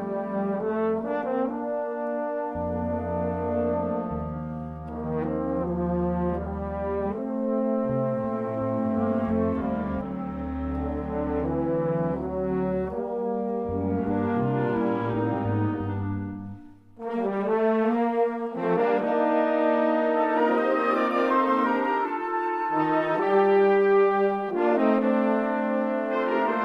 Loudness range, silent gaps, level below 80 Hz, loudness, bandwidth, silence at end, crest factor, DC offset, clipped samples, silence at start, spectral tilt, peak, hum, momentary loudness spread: 6 LU; none; -46 dBFS; -26 LUFS; 6 kHz; 0 s; 16 dB; under 0.1%; under 0.1%; 0 s; -9.5 dB/octave; -10 dBFS; none; 8 LU